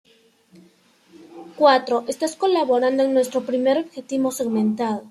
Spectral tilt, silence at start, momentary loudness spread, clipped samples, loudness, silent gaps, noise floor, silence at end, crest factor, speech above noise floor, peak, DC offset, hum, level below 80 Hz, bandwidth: -4.5 dB/octave; 1.2 s; 8 LU; under 0.1%; -20 LUFS; none; -56 dBFS; 0 s; 20 dB; 36 dB; -2 dBFS; under 0.1%; none; -70 dBFS; 14 kHz